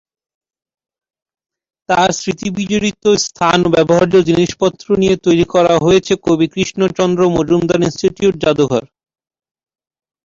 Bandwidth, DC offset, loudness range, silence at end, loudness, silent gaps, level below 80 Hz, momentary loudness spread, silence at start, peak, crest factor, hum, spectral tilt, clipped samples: 7.8 kHz; under 0.1%; 4 LU; 1.4 s; -14 LUFS; none; -44 dBFS; 5 LU; 1.9 s; 0 dBFS; 14 dB; none; -5 dB/octave; under 0.1%